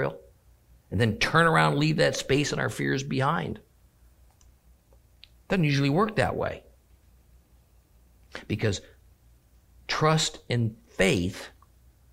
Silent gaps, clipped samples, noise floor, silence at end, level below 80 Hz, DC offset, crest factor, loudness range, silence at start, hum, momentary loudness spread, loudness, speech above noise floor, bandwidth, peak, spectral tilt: none; under 0.1%; -59 dBFS; 0.65 s; -52 dBFS; under 0.1%; 22 dB; 8 LU; 0 s; none; 18 LU; -26 LUFS; 34 dB; 16 kHz; -6 dBFS; -5 dB/octave